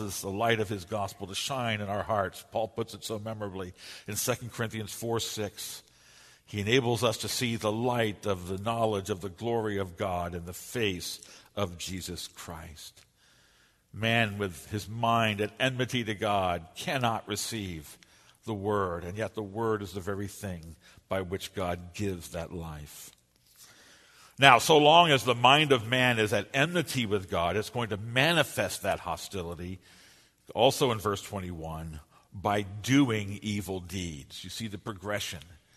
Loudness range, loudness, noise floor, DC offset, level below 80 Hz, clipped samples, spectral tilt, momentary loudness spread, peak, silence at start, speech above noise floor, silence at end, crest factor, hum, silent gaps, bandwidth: 12 LU; -29 LUFS; -65 dBFS; under 0.1%; -58 dBFS; under 0.1%; -4 dB/octave; 16 LU; -2 dBFS; 0 s; 35 dB; 0.2 s; 30 dB; none; none; 13.5 kHz